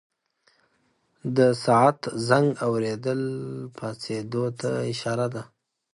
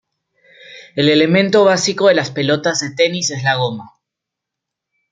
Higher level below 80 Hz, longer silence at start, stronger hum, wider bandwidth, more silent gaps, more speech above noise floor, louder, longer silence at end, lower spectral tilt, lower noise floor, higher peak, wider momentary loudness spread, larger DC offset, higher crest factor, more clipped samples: second, -66 dBFS vs -60 dBFS; first, 1.25 s vs 0.7 s; neither; first, 11.5 kHz vs 9.4 kHz; neither; second, 44 dB vs 67 dB; second, -25 LUFS vs -15 LUFS; second, 0.5 s vs 1.25 s; first, -6 dB/octave vs -4 dB/octave; second, -69 dBFS vs -82 dBFS; second, -6 dBFS vs 0 dBFS; first, 14 LU vs 7 LU; neither; about the same, 20 dB vs 16 dB; neither